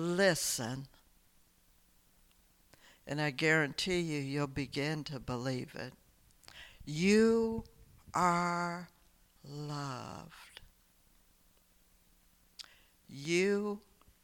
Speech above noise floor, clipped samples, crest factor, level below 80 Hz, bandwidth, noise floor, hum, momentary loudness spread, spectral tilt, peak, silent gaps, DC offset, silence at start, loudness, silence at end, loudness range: 34 dB; under 0.1%; 20 dB; -62 dBFS; 19 kHz; -68 dBFS; none; 24 LU; -4.5 dB/octave; -16 dBFS; none; under 0.1%; 0 s; -34 LUFS; 0.45 s; 14 LU